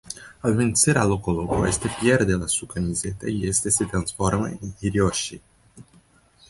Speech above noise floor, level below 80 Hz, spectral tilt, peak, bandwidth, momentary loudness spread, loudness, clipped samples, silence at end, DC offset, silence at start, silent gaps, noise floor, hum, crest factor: 34 dB; -42 dBFS; -4.5 dB/octave; -4 dBFS; 12 kHz; 9 LU; -23 LUFS; under 0.1%; 0.7 s; under 0.1%; 0.05 s; none; -56 dBFS; none; 20 dB